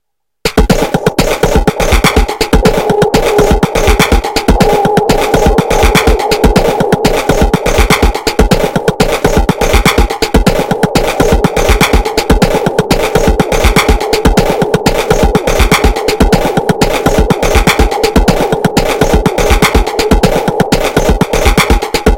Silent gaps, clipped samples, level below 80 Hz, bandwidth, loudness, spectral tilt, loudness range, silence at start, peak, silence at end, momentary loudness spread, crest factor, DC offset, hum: none; 2%; -14 dBFS; 17.5 kHz; -10 LUFS; -5 dB/octave; 1 LU; 0.45 s; 0 dBFS; 0 s; 3 LU; 8 dB; under 0.1%; none